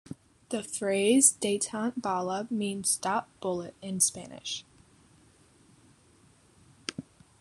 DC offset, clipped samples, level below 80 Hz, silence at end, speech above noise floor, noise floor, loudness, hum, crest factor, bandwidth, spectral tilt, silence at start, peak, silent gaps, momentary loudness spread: under 0.1%; under 0.1%; -70 dBFS; 0.4 s; 32 dB; -61 dBFS; -28 LUFS; none; 26 dB; 13 kHz; -3 dB/octave; 0.1 s; -6 dBFS; none; 18 LU